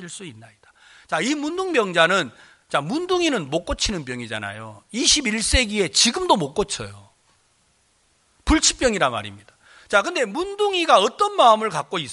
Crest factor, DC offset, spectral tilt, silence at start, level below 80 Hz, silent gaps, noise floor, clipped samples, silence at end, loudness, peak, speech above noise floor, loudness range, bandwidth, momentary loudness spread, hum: 20 dB; under 0.1%; -2.5 dB/octave; 0 s; -38 dBFS; none; -63 dBFS; under 0.1%; 0 s; -20 LUFS; -2 dBFS; 42 dB; 3 LU; 11.5 kHz; 15 LU; none